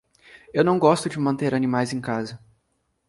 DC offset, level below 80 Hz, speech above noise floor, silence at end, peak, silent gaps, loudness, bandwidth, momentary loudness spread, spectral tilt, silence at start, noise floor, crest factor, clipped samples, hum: under 0.1%; -62 dBFS; 50 dB; 0.7 s; -4 dBFS; none; -22 LUFS; 11.5 kHz; 10 LU; -6 dB/octave; 0.55 s; -72 dBFS; 20 dB; under 0.1%; none